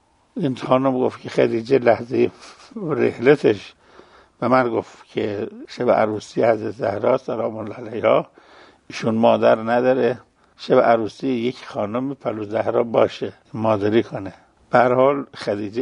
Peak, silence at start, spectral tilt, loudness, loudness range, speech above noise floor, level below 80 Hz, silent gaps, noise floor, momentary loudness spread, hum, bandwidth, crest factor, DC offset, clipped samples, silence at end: 0 dBFS; 0.35 s; -7 dB/octave; -20 LUFS; 3 LU; 29 dB; -62 dBFS; none; -49 dBFS; 14 LU; none; 10.5 kHz; 20 dB; under 0.1%; under 0.1%; 0 s